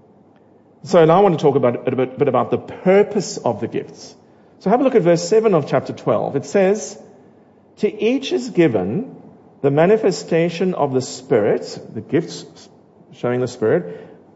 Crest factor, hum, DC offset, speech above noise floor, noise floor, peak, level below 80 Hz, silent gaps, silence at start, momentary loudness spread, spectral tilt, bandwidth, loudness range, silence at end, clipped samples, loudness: 16 dB; none; under 0.1%; 33 dB; -50 dBFS; -2 dBFS; -62 dBFS; none; 0.85 s; 12 LU; -6 dB/octave; 8 kHz; 5 LU; 0.3 s; under 0.1%; -18 LUFS